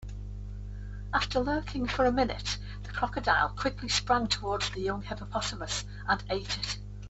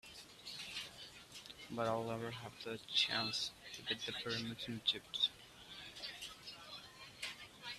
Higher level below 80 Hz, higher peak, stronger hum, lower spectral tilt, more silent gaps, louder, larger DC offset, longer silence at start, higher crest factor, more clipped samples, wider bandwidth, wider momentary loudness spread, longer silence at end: first, -42 dBFS vs -74 dBFS; first, -10 dBFS vs -20 dBFS; first, 50 Hz at -40 dBFS vs none; about the same, -4 dB/octave vs -3 dB/octave; neither; first, -30 LUFS vs -41 LUFS; neither; about the same, 0 s vs 0.05 s; about the same, 20 dB vs 24 dB; neither; second, 8.4 kHz vs 15 kHz; about the same, 15 LU vs 16 LU; about the same, 0 s vs 0 s